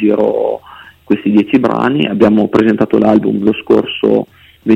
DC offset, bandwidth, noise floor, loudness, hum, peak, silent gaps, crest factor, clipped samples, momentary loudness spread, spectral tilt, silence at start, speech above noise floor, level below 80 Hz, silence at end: under 0.1%; 6.8 kHz; -37 dBFS; -12 LUFS; none; 0 dBFS; none; 12 dB; under 0.1%; 7 LU; -8 dB/octave; 0 s; 26 dB; -48 dBFS; 0 s